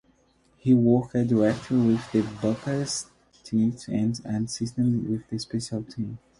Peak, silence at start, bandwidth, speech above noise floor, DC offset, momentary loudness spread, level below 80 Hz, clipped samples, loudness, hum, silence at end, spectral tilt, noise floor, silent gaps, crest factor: -8 dBFS; 0.65 s; 11.5 kHz; 39 dB; under 0.1%; 10 LU; -56 dBFS; under 0.1%; -26 LUFS; none; 0.2 s; -6.5 dB/octave; -63 dBFS; none; 16 dB